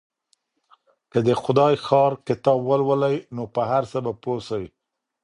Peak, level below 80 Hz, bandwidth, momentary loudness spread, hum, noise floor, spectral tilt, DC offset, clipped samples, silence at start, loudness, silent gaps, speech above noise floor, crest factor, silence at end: -2 dBFS; -60 dBFS; 10.5 kHz; 10 LU; none; -69 dBFS; -7.5 dB/octave; under 0.1%; under 0.1%; 1.15 s; -22 LUFS; none; 48 dB; 20 dB; 0.55 s